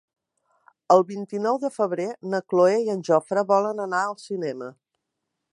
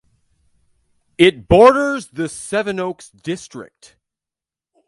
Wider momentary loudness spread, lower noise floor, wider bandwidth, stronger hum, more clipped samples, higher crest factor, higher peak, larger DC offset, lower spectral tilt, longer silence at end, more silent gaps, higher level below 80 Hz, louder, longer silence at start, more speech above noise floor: second, 10 LU vs 19 LU; second, -81 dBFS vs -89 dBFS; about the same, 11 kHz vs 11.5 kHz; neither; neither; about the same, 20 dB vs 18 dB; second, -4 dBFS vs 0 dBFS; neither; about the same, -6 dB/octave vs -5 dB/octave; second, 0.8 s vs 1.25 s; neither; second, -80 dBFS vs -42 dBFS; second, -23 LUFS vs -16 LUFS; second, 0.9 s vs 1.2 s; second, 58 dB vs 73 dB